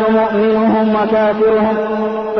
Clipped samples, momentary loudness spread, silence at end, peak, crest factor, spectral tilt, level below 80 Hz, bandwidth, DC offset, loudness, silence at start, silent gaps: under 0.1%; 5 LU; 0 s; -4 dBFS; 8 dB; -8.5 dB/octave; -46 dBFS; 5.8 kHz; 0.2%; -14 LUFS; 0 s; none